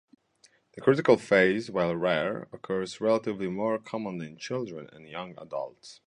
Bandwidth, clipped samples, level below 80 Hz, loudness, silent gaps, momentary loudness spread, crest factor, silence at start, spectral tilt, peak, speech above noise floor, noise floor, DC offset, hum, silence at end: 11 kHz; under 0.1%; -66 dBFS; -28 LUFS; none; 17 LU; 22 dB; 0.75 s; -6 dB/octave; -6 dBFS; 36 dB; -64 dBFS; under 0.1%; none; 0.15 s